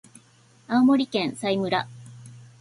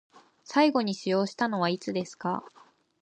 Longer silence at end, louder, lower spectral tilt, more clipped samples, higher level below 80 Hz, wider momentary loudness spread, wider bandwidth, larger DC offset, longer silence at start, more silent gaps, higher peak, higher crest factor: second, 0.2 s vs 0.55 s; first, -23 LUFS vs -28 LUFS; about the same, -5.5 dB/octave vs -5.5 dB/octave; neither; first, -66 dBFS vs -76 dBFS; first, 21 LU vs 9 LU; first, 11.5 kHz vs 9.6 kHz; neither; first, 0.7 s vs 0.5 s; neither; about the same, -10 dBFS vs -10 dBFS; about the same, 16 dB vs 18 dB